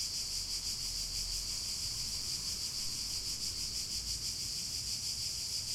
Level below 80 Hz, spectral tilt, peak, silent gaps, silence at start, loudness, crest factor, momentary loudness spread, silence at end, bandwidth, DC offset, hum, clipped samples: -52 dBFS; 0 dB/octave; -24 dBFS; none; 0 s; -35 LUFS; 14 dB; 1 LU; 0 s; 16.5 kHz; under 0.1%; none; under 0.1%